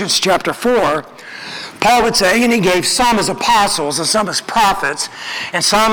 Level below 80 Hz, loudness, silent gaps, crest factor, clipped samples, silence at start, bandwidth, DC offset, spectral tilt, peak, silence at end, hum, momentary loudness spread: -42 dBFS; -14 LUFS; none; 14 dB; under 0.1%; 0 s; over 20 kHz; under 0.1%; -2.5 dB/octave; 0 dBFS; 0 s; none; 11 LU